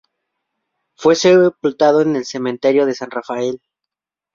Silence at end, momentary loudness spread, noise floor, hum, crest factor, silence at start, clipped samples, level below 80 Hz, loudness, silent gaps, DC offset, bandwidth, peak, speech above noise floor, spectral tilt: 0.8 s; 13 LU; -84 dBFS; none; 16 dB; 1 s; under 0.1%; -62 dBFS; -16 LUFS; none; under 0.1%; 7.6 kHz; -2 dBFS; 69 dB; -5 dB/octave